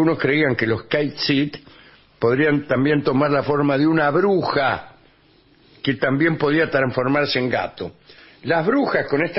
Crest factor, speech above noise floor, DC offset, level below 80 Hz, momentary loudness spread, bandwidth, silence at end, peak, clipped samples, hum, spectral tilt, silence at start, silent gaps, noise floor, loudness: 14 dB; 35 dB; under 0.1%; -54 dBFS; 8 LU; 5.8 kHz; 0 s; -6 dBFS; under 0.1%; none; -9.5 dB/octave; 0 s; none; -55 dBFS; -19 LUFS